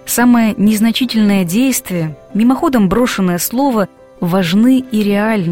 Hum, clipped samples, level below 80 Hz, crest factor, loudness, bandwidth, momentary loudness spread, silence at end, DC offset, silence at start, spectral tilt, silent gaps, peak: none; under 0.1%; -42 dBFS; 12 dB; -13 LUFS; 16.5 kHz; 7 LU; 0 s; 0.6%; 0.05 s; -5 dB/octave; none; -2 dBFS